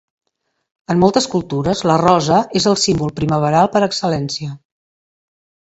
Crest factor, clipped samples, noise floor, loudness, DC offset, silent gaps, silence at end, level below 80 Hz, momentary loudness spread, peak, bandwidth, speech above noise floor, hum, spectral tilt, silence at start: 16 dB; under 0.1%; -72 dBFS; -16 LUFS; under 0.1%; none; 1.1 s; -46 dBFS; 7 LU; 0 dBFS; 8.2 kHz; 56 dB; none; -5 dB/octave; 0.9 s